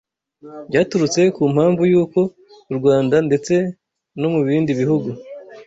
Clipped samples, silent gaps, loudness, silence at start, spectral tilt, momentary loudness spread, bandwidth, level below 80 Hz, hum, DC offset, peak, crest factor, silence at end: under 0.1%; none; -17 LUFS; 0.45 s; -6.5 dB/octave; 13 LU; 8 kHz; -56 dBFS; none; under 0.1%; -2 dBFS; 16 dB; 0.05 s